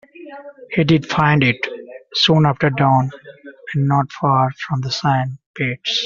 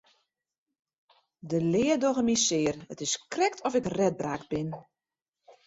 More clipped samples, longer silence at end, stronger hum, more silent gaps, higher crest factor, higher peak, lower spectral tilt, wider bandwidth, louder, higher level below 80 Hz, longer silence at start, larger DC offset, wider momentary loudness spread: neither; second, 0 s vs 0.15 s; neither; about the same, 5.46-5.54 s vs 5.22-5.26 s; about the same, 16 dB vs 18 dB; first, -2 dBFS vs -12 dBFS; about the same, -4 dB/octave vs -4 dB/octave; second, 7.4 kHz vs 8.2 kHz; first, -17 LUFS vs -28 LUFS; first, -52 dBFS vs -62 dBFS; second, 0.2 s vs 1.45 s; neither; first, 17 LU vs 10 LU